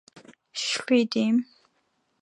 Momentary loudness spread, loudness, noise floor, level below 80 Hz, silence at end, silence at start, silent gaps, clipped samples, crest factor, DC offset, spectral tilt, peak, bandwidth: 14 LU; -25 LUFS; -72 dBFS; -80 dBFS; 0.8 s; 0.55 s; none; under 0.1%; 18 dB; under 0.1%; -3.5 dB/octave; -10 dBFS; 11 kHz